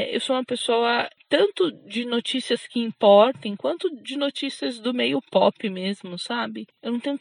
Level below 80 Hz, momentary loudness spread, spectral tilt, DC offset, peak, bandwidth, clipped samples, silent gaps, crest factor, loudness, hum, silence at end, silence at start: -82 dBFS; 11 LU; -4.5 dB/octave; under 0.1%; -4 dBFS; 10.5 kHz; under 0.1%; none; 20 dB; -23 LUFS; none; 0.05 s; 0 s